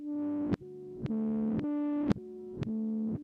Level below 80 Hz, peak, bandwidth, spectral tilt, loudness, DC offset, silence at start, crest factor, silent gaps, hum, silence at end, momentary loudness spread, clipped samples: -60 dBFS; -14 dBFS; 6.6 kHz; -9.5 dB/octave; -34 LUFS; under 0.1%; 0 s; 18 dB; none; none; 0 s; 8 LU; under 0.1%